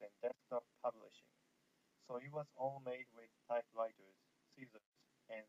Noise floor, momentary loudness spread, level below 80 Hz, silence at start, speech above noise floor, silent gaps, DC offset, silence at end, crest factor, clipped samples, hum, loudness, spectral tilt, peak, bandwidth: -80 dBFS; 17 LU; under -90 dBFS; 0 s; 33 dB; 4.86-4.92 s; under 0.1%; 0.05 s; 20 dB; under 0.1%; none; -47 LUFS; -6.5 dB/octave; -30 dBFS; 8 kHz